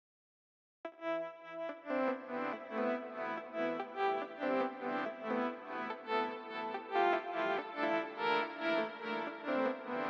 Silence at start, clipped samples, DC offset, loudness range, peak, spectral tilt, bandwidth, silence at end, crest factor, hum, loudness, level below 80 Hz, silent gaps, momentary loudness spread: 0.85 s; under 0.1%; under 0.1%; 4 LU; -20 dBFS; -5.5 dB/octave; 7.4 kHz; 0 s; 18 dB; none; -37 LUFS; under -90 dBFS; none; 7 LU